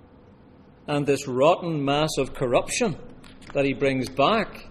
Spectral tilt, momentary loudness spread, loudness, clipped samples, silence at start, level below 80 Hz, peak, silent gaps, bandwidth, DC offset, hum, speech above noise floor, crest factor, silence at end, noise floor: -5 dB/octave; 8 LU; -24 LUFS; under 0.1%; 0.9 s; -46 dBFS; -6 dBFS; none; 14 kHz; under 0.1%; none; 28 dB; 18 dB; 0 s; -51 dBFS